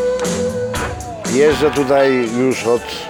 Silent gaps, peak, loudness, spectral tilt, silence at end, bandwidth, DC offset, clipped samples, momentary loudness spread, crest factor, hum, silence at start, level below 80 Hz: none; -2 dBFS; -16 LUFS; -4.5 dB/octave; 0 s; 18.5 kHz; under 0.1%; under 0.1%; 9 LU; 14 dB; none; 0 s; -38 dBFS